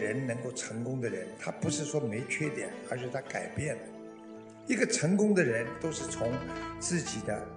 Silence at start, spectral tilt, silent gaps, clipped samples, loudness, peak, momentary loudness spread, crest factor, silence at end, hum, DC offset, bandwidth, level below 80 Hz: 0 s; -4.5 dB/octave; none; under 0.1%; -33 LUFS; -12 dBFS; 12 LU; 22 dB; 0 s; none; under 0.1%; 10 kHz; -62 dBFS